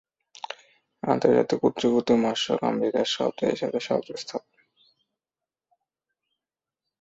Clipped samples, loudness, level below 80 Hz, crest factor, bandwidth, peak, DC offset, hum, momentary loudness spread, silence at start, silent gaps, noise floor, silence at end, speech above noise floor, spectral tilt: under 0.1%; -25 LUFS; -68 dBFS; 22 dB; 8 kHz; -4 dBFS; under 0.1%; none; 17 LU; 0.5 s; none; under -90 dBFS; 2.65 s; over 66 dB; -5 dB/octave